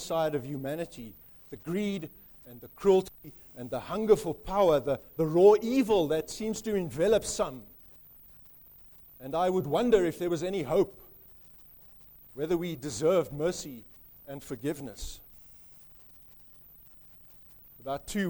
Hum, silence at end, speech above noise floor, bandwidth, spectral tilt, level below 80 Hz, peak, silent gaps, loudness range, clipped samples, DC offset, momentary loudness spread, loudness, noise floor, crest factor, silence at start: none; 0 s; 25 dB; over 20 kHz; -5.5 dB/octave; -54 dBFS; -10 dBFS; none; 16 LU; under 0.1%; under 0.1%; 25 LU; -29 LUFS; -54 dBFS; 20 dB; 0 s